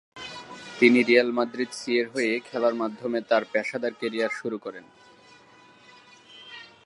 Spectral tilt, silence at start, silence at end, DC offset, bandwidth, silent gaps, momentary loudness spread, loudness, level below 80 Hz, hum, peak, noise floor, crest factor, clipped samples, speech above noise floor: -4.5 dB/octave; 0.15 s; 0.2 s; under 0.1%; 11.5 kHz; none; 21 LU; -25 LUFS; -76 dBFS; none; -4 dBFS; -54 dBFS; 22 dB; under 0.1%; 29 dB